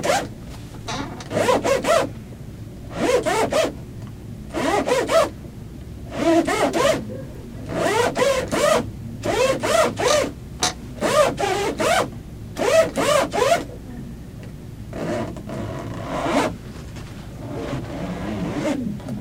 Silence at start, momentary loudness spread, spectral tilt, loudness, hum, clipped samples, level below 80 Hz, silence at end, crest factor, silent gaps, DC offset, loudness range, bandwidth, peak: 0 s; 18 LU; -4 dB/octave; -21 LUFS; none; under 0.1%; -42 dBFS; 0 s; 18 dB; none; under 0.1%; 7 LU; 16.5 kHz; -4 dBFS